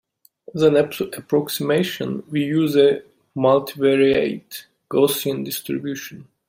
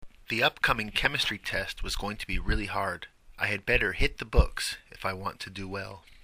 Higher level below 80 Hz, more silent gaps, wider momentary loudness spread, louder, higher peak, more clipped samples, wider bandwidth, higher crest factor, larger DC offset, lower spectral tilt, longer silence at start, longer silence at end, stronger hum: second, -60 dBFS vs -36 dBFS; neither; first, 15 LU vs 11 LU; first, -20 LUFS vs -29 LUFS; first, -2 dBFS vs -6 dBFS; neither; about the same, 16.5 kHz vs 15.5 kHz; about the same, 18 dB vs 22 dB; neither; first, -5.5 dB/octave vs -4 dB/octave; first, 0.55 s vs 0 s; first, 0.25 s vs 0.1 s; neither